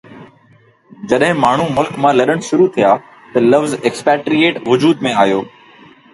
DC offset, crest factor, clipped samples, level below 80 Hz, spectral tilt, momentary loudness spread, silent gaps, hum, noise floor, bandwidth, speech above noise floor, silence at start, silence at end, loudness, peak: under 0.1%; 14 dB; under 0.1%; -54 dBFS; -5.5 dB/octave; 6 LU; none; none; -49 dBFS; 11.5 kHz; 36 dB; 0.1 s; 0.65 s; -14 LUFS; 0 dBFS